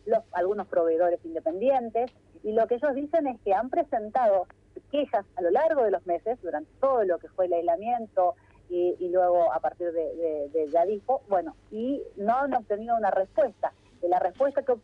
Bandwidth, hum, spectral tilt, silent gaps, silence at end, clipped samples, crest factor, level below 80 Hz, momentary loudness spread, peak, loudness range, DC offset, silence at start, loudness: 5.6 kHz; 50 Hz at -65 dBFS; -7.5 dB/octave; none; 0.05 s; under 0.1%; 14 dB; -62 dBFS; 7 LU; -12 dBFS; 1 LU; under 0.1%; 0.05 s; -27 LUFS